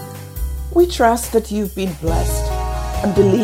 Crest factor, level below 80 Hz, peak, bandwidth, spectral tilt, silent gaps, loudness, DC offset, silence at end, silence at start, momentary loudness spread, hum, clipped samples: 16 dB; -26 dBFS; 0 dBFS; 16 kHz; -6 dB/octave; none; -18 LUFS; under 0.1%; 0 s; 0 s; 12 LU; none; under 0.1%